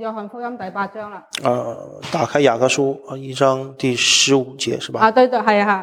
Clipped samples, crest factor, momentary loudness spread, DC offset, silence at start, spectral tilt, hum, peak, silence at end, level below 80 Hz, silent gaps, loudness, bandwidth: under 0.1%; 16 dB; 16 LU; under 0.1%; 0 s; -3 dB/octave; none; -2 dBFS; 0 s; -64 dBFS; none; -17 LUFS; 16 kHz